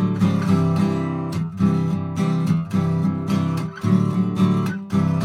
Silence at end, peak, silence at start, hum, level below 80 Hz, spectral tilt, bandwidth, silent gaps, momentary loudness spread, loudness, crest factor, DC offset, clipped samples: 0 s; -6 dBFS; 0 s; none; -60 dBFS; -8 dB/octave; 12 kHz; none; 5 LU; -21 LUFS; 14 dB; under 0.1%; under 0.1%